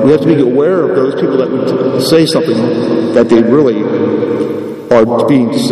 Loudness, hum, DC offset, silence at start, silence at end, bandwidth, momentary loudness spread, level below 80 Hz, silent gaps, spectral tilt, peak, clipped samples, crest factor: -11 LUFS; none; under 0.1%; 0 s; 0 s; 14 kHz; 5 LU; -48 dBFS; none; -6.5 dB/octave; 0 dBFS; 0.6%; 10 dB